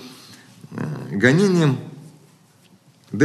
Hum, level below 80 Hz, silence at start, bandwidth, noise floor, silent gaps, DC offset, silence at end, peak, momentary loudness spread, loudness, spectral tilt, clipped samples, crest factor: none; -64 dBFS; 0 s; 13 kHz; -54 dBFS; none; under 0.1%; 0 s; -2 dBFS; 24 LU; -19 LUFS; -6.5 dB/octave; under 0.1%; 20 dB